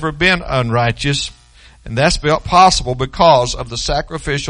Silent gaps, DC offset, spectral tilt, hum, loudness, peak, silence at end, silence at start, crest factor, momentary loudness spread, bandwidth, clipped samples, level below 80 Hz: none; under 0.1%; -4 dB/octave; none; -14 LUFS; 0 dBFS; 0 s; 0 s; 16 dB; 11 LU; 10.5 kHz; under 0.1%; -30 dBFS